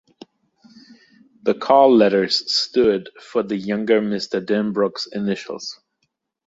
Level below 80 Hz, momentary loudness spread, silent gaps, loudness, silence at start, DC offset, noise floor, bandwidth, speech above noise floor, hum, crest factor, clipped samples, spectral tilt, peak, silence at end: -60 dBFS; 12 LU; none; -19 LUFS; 0.9 s; under 0.1%; -73 dBFS; 8 kHz; 54 dB; none; 18 dB; under 0.1%; -5 dB/octave; -2 dBFS; 0.75 s